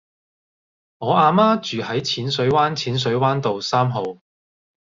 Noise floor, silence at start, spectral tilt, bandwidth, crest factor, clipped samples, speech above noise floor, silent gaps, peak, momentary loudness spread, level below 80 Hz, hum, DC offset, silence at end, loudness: under -90 dBFS; 1 s; -5.5 dB/octave; 7.6 kHz; 18 dB; under 0.1%; over 71 dB; none; -2 dBFS; 8 LU; -58 dBFS; none; under 0.1%; 0.75 s; -19 LUFS